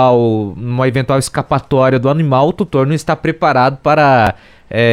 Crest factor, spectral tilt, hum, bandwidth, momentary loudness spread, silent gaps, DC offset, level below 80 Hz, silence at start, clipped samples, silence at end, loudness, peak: 12 dB; -6.5 dB/octave; none; 14.5 kHz; 6 LU; none; under 0.1%; -42 dBFS; 0 s; under 0.1%; 0 s; -13 LUFS; 0 dBFS